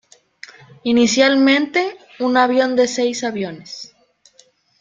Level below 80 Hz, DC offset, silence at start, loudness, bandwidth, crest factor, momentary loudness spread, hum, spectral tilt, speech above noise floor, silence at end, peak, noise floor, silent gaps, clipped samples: -62 dBFS; under 0.1%; 0.85 s; -17 LUFS; 9.2 kHz; 18 dB; 18 LU; none; -3 dB/octave; 38 dB; 0.95 s; -2 dBFS; -55 dBFS; none; under 0.1%